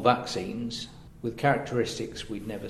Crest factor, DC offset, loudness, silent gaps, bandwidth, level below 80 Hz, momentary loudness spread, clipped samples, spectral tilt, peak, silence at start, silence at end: 22 dB; under 0.1%; -30 LUFS; none; 14 kHz; -52 dBFS; 11 LU; under 0.1%; -5 dB/octave; -6 dBFS; 0 s; 0 s